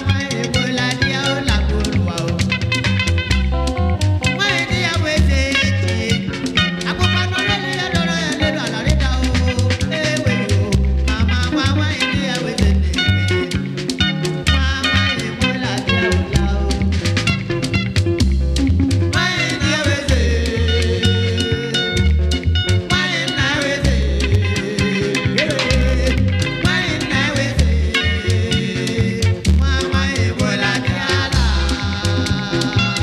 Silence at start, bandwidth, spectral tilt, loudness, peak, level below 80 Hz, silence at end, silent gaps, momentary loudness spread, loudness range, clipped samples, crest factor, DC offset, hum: 0 s; 13 kHz; -5 dB/octave; -17 LUFS; 0 dBFS; -24 dBFS; 0 s; none; 3 LU; 1 LU; under 0.1%; 16 dB; under 0.1%; none